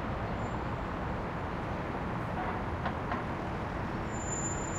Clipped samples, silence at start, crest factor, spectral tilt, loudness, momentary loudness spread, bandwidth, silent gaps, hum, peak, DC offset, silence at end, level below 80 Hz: under 0.1%; 0 s; 14 dB; -5 dB/octave; -36 LUFS; 2 LU; 14.5 kHz; none; none; -20 dBFS; under 0.1%; 0 s; -44 dBFS